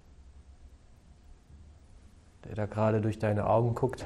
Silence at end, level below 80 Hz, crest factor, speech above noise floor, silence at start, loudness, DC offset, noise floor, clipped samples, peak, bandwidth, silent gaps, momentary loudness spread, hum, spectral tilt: 0 s; -54 dBFS; 18 dB; 27 dB; 0.2 s; -30 LUFS; under 0.1%; -56 dBFS; under 0.1%; -14 dBFS; 11.5 kHz; none; 13 LU; none; -8.5 dB/octave